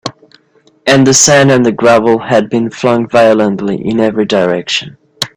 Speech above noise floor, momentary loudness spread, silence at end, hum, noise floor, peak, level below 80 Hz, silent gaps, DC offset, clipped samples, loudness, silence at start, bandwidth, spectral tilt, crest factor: 40 dB; 10 LU; 0.1 s; none; -50 dBFS; 0 dBFS; -48 dBFS; none; under 0.1%; 0.1%; -9 LUFS; 0.05 s; over 20 kHz; -4 dB/octave; 10 dB